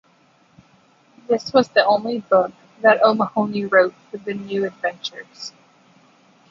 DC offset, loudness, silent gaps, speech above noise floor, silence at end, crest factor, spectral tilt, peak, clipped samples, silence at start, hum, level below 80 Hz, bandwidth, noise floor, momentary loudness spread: under 0.1%; -19 LUFS; none; 38 dB; 1 s; 20 dB; -5 dB/octave; -2 dBFS; under 0.1%; 1.3 s; none; -66 dBFS; 7.6 kHz; -57 dBFS; 16 LU